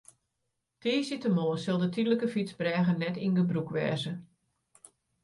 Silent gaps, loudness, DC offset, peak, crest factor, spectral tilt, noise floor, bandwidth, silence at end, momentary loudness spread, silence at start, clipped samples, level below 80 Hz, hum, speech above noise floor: none; -30 LUFS; under 0.1%; -16 dBFS; 16 dB; -7 dB/octave; -82 dBFS; 11.5 kHz; 1 s; 5 LU; 0.85 s; under 0.1%; -74 dBFS; none; 53 dB